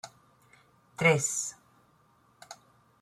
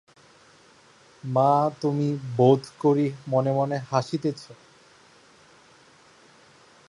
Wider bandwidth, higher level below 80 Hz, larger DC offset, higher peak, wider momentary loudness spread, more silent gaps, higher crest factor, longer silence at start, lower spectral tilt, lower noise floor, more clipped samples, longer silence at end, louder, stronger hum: first, 14 kHz vs 11 kHz; about the same, -72 dBFS vs -70 dBFS; neither; second, -12 dBFS vs -6 dBFS; first, 25 LU vs 9 LU; neither; about the same, 22 dB vs 20 dB; second, 0.05 s vs 1.25 s; second, -3.5 dB/octave vs -8 dB/octave; first, -65 dBFS vs -55 dBFS; neither; second, 0.45 s vs 2.35 s; second, -27 LUFS vs -24 LUFS; neither